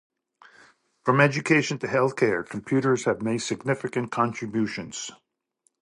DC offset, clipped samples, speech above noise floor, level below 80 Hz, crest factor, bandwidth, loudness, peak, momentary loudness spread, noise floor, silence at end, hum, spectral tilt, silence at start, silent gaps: under 0.1%; under 0.1%; 47 dB; -66 dBFS; 22 dB; 11.5 kHz; -25 LUFS; -4 dBFS; 10 LU; -71 dBFS; 0.65 s; none; -5.5 dB/octave; 1.05 s; none